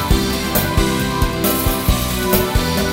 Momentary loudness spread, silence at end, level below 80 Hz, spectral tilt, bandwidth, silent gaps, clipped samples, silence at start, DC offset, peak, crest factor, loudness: 2 LU; 0 s; -22 dBFS; -4.5 dB/octave; 16.5 kHz; none; under 0.1%; 0 s; under 0.1%; -2 dBFS; 14 dB; -17 LUFS